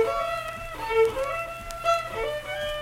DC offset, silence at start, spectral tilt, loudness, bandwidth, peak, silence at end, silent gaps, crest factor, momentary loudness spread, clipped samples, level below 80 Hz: under 0.1%; 0 s; -3 dB/octave; -27 LUFS; 16.5 kHz; -10 dBFS; 0 s; none; 16 dB; 10 LU; under 0.1%; -46 dBFS